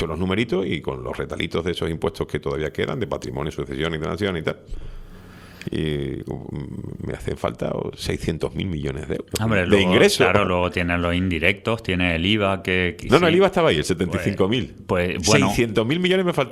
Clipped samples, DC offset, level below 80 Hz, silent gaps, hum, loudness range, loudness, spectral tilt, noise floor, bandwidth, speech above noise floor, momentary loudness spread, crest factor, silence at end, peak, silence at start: under 0.1%; under 0.1%; -42 dBFS; none; none; 9 LU; -22 LUFS; -5 dB/octave; -42 dBFS; 15 kHz; 20 dB; 12 LU; 22 dB; 0 s; 0 dBFS; 0 s